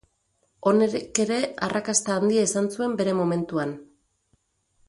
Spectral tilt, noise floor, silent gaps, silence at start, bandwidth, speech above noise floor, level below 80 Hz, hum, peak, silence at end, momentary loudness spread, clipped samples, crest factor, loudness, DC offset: -4.5 dB/octave; -70 dBFS; none; 0.65 s; 11.5 kHz; 47 dB; -64 dBFS; none; -4 dBFS; 1.05 s; 7 LU; under 0.1%; 20 dB; -24 LUFS; under 0.1%